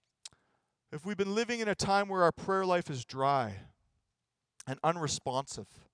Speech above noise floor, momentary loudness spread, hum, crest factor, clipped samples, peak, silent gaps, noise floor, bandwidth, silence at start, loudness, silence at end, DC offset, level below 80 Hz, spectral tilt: 54 dB; 19 LU; none; 22 dB; under 0.1%; -12 dBFS; none; -87 dBFS; 10.5 kHz; 0.9 s; -32 LUFS; 0.3 s; under 0.1%; -66 dBFS; -4.5 dB/octave